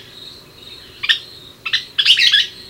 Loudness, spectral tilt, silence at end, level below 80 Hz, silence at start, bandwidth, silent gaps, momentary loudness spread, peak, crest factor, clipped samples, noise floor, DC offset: -14 LUFS; 1 dB/octave; 0 s; -56 dBFS; 0.15 s; 17 kHz; none; 26 LU; 0 dBFS; 20 dB; under 0.1%; -39 dBFS; under 0.1%